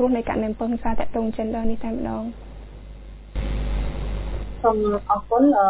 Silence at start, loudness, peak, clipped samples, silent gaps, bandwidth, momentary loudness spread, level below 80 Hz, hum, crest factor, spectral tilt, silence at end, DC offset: 0 s; -25 LUFS; -6 dBFS; under 0.1%; none; 4 kHz; 21 LU; -32 dBFS; none; 16 dB; -11.5 dB/octave; 0 s; under 0.1%